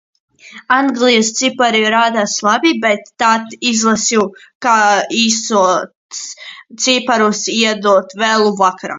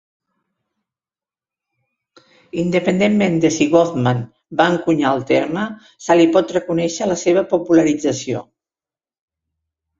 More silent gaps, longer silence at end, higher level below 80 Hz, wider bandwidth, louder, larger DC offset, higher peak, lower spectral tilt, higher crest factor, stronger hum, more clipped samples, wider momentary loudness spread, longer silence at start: first, 4.55-4.60 s, 5.95-6.09 s vs none; second, 0 s vs 1.6 s; second, -62 dBFS vs -56 dBFS; about the same, 7.8 kHz vs 7.8 kHz; first, -13 LUFS vs -17 LUFS; neither; about the same, 0 dBFS vs 0 dBFS; second, -2.5 dB/octave vs -5.5 dB/octave; about the same, 14 dB vs 18 dB; neither; neither; about the same, 8 LU vs 10 LU; second, 0.45 s vs 2.55 s